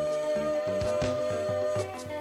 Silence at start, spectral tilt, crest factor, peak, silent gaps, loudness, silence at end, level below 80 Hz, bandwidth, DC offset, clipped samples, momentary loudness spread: 0 s; -5.5 dB/octave; 12 dB; -18 dBFS; none; -30 LUFS; 0 s; -54 dBFS; 14.5 kHz; under 0.1%; under 0.1%; 3 LU